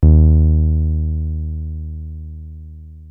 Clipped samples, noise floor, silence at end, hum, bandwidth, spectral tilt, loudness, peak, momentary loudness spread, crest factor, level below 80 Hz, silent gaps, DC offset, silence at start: under 0.1%; -35 dBFS; 0 s; none; 1.1 kHz; -14.5 dB/octave; -17 LUFS; 0 dBFS; 24 LU; 16 dB; -18 dBFS; none; under 0.1%; 0 s